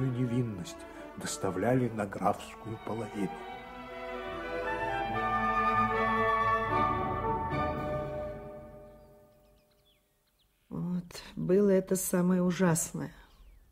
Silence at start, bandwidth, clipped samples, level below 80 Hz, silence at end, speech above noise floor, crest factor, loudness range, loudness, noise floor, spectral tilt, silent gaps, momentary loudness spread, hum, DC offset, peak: 0 s; 16 kHz; under 0.1%; -52 dBFS; 0.2 s; 40 dB; 20 dB; 10 LU; -31 LUFS; -71 dBFS; -5.5 dB/octave; none; 16 LU; none; under 0.1%; -14 dBFS